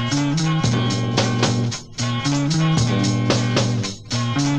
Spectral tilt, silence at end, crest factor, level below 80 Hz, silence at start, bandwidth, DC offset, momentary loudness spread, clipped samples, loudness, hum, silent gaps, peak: -5 dB/octave; 0 s; 18 dB; -44 dBFS; 0 s; 9.8 kHz; under 0.1%; 6 LU; under 0.1%; -20 LUFS; none; none; -2 dBFS